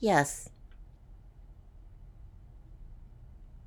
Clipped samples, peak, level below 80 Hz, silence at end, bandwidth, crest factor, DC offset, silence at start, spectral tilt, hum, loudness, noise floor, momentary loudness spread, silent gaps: under 0.1%; -10 dBFS; -52 dBFS; 0.1 s; 19.5 kHz; 26 dB; under 0.1%; 0 s; -4.5 dB/octave; none; -30 LUFS; -53 dBFS; 25 LU; none